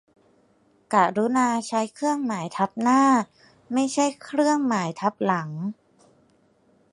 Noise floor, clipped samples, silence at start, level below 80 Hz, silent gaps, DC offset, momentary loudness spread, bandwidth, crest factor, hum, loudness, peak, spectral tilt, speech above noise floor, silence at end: -62 dBFS; under 0.1%; 0.9 s; -74 dBFS; none; under 0.1%; 9 LU; 11.5 kHz; 20 dB; none; -23 LUFS; -4 dBFS; -5 dB/octave; 39 dB; 1.2 s